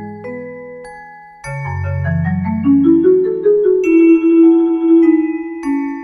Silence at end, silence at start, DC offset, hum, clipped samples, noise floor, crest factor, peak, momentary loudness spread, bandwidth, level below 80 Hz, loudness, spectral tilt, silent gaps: 0 s; 0 s; under 0.1%; none; under 0.1%; -36 dBFS; 12 dB; -2 dBFS; 20 LU; 6.4 kHz; -48 dBFS; -13 LUFS; -9.5 dB/octave; none